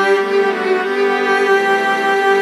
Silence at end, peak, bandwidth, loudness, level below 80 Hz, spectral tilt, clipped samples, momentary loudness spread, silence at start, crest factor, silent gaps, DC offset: 0 s; -2 dBFS; 12.5 kHz; -14 LUFS; -70 dBFS; -3.5 dB/octave; under 0.1%; 3 LU; 0 s; 12 dB; none; under 0.1%